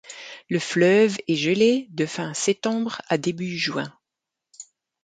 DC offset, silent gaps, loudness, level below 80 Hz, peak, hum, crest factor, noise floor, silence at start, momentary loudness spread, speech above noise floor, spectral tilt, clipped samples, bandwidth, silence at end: under 0.1%; none; -22 LUFS; -70 dBFS; -6 dBFS; none; 18 dB; -85 dBFS; 0.05 s; 19 LU; 63 dB; -4.5 dB/octave; under 0.1%; 9.4 kHz; 0.4 s